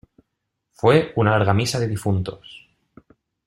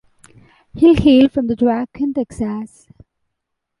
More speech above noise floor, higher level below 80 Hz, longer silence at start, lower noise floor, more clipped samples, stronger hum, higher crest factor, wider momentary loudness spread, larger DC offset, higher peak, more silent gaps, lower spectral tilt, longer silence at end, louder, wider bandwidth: about the same, 59 dB vs 62 dB; second, -54 dBFS vs -40 dBFS; about the same, 0.85 s vs 0.75 s; about the same, -78 dBFS vs -77 dBFS; neither; neither; first, 20 dB vs 14 dB; second, 9 LU vs 13 LU; neither; about the same, -2 dBFS vs -2 dBFS; neither; second, -6 dB/octave vs -7.5 dB/octave; second, 0.9 s vs 1.15 s; second, -20 LUFS vs -15 LUFS; first, 13.5 kHz vs 11 kHz